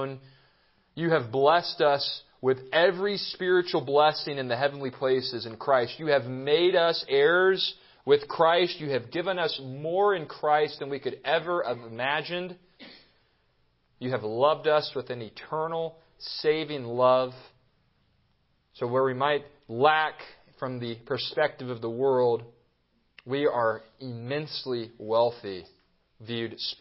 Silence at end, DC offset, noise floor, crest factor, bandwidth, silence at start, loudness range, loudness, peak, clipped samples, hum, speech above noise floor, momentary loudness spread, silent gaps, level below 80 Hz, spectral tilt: 0.05 s; under 0.1%; -70 dBFS; 22 dB; 5.8 kHz; 0 s; 6 LU; -27 LUFS; -6 dBFS; under 0.1%; none; 44 dB; 13 LU; none; -72 dBFS; -9 dB/octave